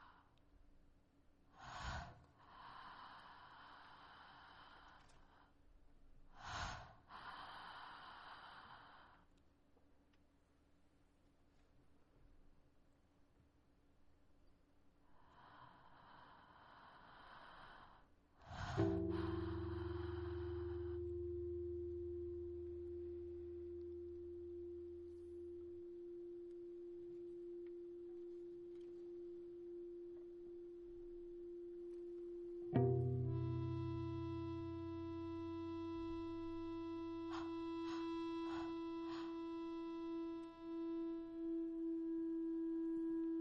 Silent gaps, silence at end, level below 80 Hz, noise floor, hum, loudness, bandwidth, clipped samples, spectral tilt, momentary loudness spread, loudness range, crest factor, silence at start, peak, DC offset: none; 0 s; -66 dBFS; -74 dBFS; none; -48 LUFS; 7.6 kHz; under 0.1%; -8 dB/octave; 18 LU; 18 LU; 24 dB; 0 s; -24 dBFS; under 0.1%